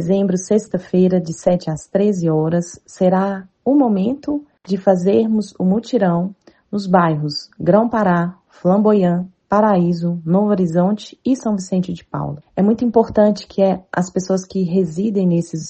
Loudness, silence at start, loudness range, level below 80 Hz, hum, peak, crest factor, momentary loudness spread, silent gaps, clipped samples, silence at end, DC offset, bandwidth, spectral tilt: -17 LUFS; 0 s; 2 LU; -54 dBFS; none; 0 dBFS; 16 dB; 9 LU; none; under 0.1%; 0 s; under 0.1%; 8.6 kHz; -7.5 dB/octave